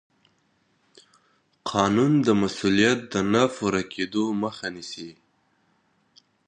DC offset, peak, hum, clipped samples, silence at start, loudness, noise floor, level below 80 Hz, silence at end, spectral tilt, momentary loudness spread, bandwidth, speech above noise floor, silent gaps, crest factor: under 0.1%; -4 dBFS; none; under 0.1%; 1.65 s; -23 LUFS; -67 dBFS; -58 dBFS; 1.35 s; -5 dB/octave; 16 LU; 9.8 kHz; 44 dB; none; 22 dB